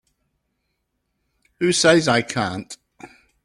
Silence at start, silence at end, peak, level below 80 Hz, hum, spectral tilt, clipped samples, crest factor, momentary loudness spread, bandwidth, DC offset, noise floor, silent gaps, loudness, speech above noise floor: 1.6 s; 0.4 s; -2 dBFS; -58 dBFS; none; -3.5 dB/octave; under 0.1%; 20 dB; 22 LU; 12.5 kHz; under 0.1%; -74 dBFS; none; -18 LUFS; 56 dB